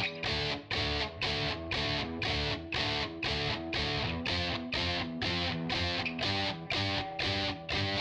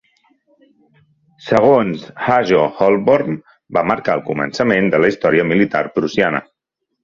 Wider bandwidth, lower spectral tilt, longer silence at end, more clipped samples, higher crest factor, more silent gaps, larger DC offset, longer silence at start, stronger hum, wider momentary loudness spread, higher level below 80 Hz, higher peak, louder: first, 10.5 kHz vs 7.4 kHz; second, -4.5 dB/octave vs -7 dB/octave; second, 0 s vs 0.6 s; neither; about the same, 16 dB vs 16 dB; neither; neither; second, 0 s vs 1.45 s; neither; second, 2 LU vs 9 LU; first, -48 dBFS vs -54 dBFS; second, -18 dBFS vs 0 dBFS; second, -32 LUFS vs -16 LUFS